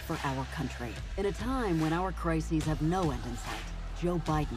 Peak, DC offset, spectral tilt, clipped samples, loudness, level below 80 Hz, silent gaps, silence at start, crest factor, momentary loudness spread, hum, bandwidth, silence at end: -16 dBFS; under 0.1%; -6 dB/octave; under 0.1%; -33 LUFS; -40 dBFS; none; 0 s; 16 dB; 9 LU; none; 15 kHz; 0 s